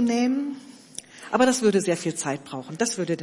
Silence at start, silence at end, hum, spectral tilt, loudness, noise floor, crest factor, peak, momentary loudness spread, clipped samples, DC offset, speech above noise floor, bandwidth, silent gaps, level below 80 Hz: 0 s; 0 s; none; -4 dB/octave; -24 LUFS; -43 dBFS; 18 dB; -6 dBFS; 19 LU; under 0.1%; under 0.1%; 19 dB; 11.5 kHz; none; -68 dBFS